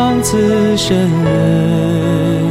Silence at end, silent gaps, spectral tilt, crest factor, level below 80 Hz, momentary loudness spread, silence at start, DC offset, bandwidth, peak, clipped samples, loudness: 0 s; none; -6 dB/octave; 10 dB; -36 dBFS; 2 LU; 0 s; under 0.1%; 15.5 kHz; -2 dBFS; under 0.1%; -13 LUFS